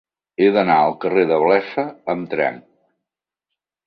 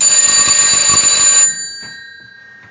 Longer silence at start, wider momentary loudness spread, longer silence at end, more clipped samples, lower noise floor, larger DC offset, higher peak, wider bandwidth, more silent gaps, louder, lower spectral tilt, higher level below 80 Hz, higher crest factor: first, 0.4 s vs 0 s; second, 10 LU vs 16 LU; first, 1.3 s vs 0.7 s; neither; first, -85 dBFS vs -38 dBFS; neither; about the same, -2 dBFS vs 0 dBFS; second, 5.4 kHz vs 7.8 kHz; neither; second, -18 LUFS vs -6 LUFS; first, -8.5 dB/octave vs 1.5 dB/octave; second, -62 dBFS vs -48 dBFS; first, 18 dB vs 12 dB